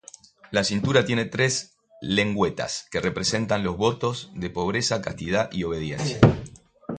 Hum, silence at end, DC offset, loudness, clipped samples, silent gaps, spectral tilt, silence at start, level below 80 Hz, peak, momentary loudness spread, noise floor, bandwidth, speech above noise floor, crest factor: none; 0 s; under 0.1%; -24 LUFS; under 0.1%; none; -4.5 dB/octave; 0.5 s; -46 dBFS; 0 dBFS; 10 LU; -49 dBFS; 9.4 kHz; 25 dB; 24 dB